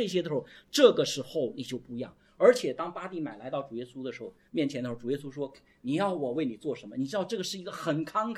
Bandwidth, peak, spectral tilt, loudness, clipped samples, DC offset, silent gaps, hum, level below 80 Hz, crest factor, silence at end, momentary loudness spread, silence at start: 14.5 kHz; -6 dBFS; -5 dB/octave; -30 LUFS; under 0.1%; under 0.1%; none; none; -70 dBFS; 24 dB; 0 s; 16 LU; 0 s